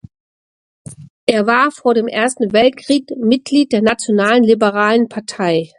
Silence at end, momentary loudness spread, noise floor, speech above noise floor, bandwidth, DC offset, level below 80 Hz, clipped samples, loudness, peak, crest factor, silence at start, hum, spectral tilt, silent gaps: 0.15 s; 6 LU; under -90 dBFS; over 76 dB; 11.5 kHz; under 0.1%; -56 dBFS; under 0.1%; -14 LUFS; 0 dBFS; 14 dB; 0.9 s; none; -4.5 dB/octave; 1.10-1.27 s